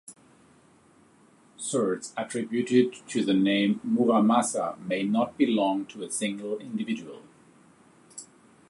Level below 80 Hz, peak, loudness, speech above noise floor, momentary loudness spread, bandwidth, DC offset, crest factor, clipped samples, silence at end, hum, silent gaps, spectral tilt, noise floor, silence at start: -74 dBFS; -8 dBFS; -26 LUFS; 33 dB; 12 LU; 11.5 kHz; under 0.1%; 20 dB; under 0.1%; 0.45 s; none; none; -4.5 dB/octave; -59 dBFS; 0.1 s